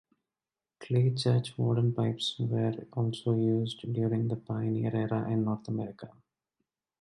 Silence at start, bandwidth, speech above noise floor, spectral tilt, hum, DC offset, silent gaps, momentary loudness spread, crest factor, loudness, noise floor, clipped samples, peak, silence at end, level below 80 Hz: 0.8 s; 11.5 kHz; over 60 dB; -7.5 dB/octave; none; under 0.1%; none; 6 LU; 14 dB; -31 LUFS; under -90 dBFS; under 0.1%; -16 dBFS; 0.9 s; -66 dBFS